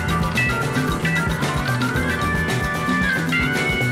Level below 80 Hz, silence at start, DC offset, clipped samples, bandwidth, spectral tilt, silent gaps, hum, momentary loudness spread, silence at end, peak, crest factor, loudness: -34 dBFS; 0 s; under 0.1%; under 0.1%; 16 kHz; -5 dB/octave; none; none; 2 LU; 0 s; -10 dBFS; 12 dB; -20 LUFS